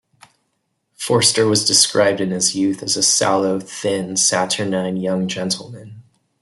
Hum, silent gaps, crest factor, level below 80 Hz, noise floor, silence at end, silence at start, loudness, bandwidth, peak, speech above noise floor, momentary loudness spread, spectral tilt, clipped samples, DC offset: none; none; 18 dB; -62 dBFS; -71 dBFS; 0.4 s; 1 s; -17 LUFS; 12.5 kHz; 0 dBFS; 53 dB; 10 LU; -2.5 dB/octave; under 0.1%; under 0.1%